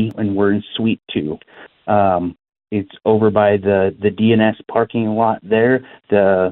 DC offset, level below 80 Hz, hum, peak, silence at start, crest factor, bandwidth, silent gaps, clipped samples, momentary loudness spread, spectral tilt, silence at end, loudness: under 0.1%; -54 dBFS; none; 0 dBFS; 0 s; 16 dB; 4.1 kHz; none; under 0.1%; 10 LU; -10.5 dB/octave; 0 s; -17 LUFS